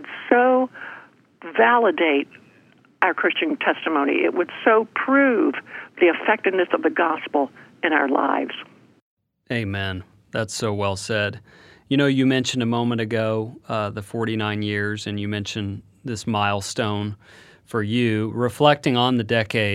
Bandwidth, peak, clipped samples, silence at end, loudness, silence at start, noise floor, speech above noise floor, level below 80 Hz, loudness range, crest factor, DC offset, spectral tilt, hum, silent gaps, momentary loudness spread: 14 kHz; 0 dBFS; under 0.1%; 0 s; -21 LUFS; 0 s; -55 dBFS; 34 dB; -62 dBFS; 6 LU; 22 dB; under 0.1%; -5.5 dB/octave; none; 9.02-9.17 s; 12 LU